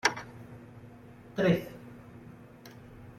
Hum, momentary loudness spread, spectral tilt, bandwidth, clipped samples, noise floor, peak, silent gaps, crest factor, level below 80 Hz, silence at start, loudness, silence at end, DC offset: none; 23 LU; -5 dB/octave; 14.5 kHz; under 0.1%; -51 dBFS; -8 dBFS; none; 28 dB; -62 dBFS; 0.05 s; -30 LUFS; 0.05 s; under 0.1%